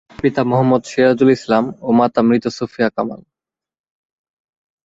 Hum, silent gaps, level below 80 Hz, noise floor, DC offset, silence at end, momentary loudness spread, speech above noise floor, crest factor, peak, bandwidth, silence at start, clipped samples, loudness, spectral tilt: none; none; -54 dBFS; -89 dBFS; under 0.1%; 1.65 s; 6 LU; 73 dB; 16 dB; -2 dBFS; 7.8 kHz; 0.25 s; under 0.1%; -16 LUFS; -7 dB/octave